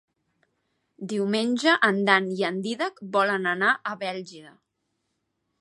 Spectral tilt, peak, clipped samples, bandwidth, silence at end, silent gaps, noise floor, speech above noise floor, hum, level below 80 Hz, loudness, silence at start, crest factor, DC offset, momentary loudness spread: -4.5 dB/octave; -2 dBFS; under 0.1%; 11.5 kHz; 1.1 s; none; -77 dBFS; 53 dB; none; -78 dBFS; -24 LUFS; 1 s; 24 dB; under 0.1%; 12 LU